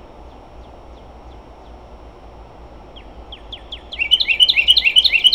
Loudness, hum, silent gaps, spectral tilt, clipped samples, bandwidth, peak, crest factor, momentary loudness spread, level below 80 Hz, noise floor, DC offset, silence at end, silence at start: -11 LUFS; none; none; 0 dB/octave; under 0.1%; over 20 kHz; -2 dBFS; 18 dB; 23 LU; -42 dBFS; -39 dBFS; under 0.1%; 0 s; 0.2 s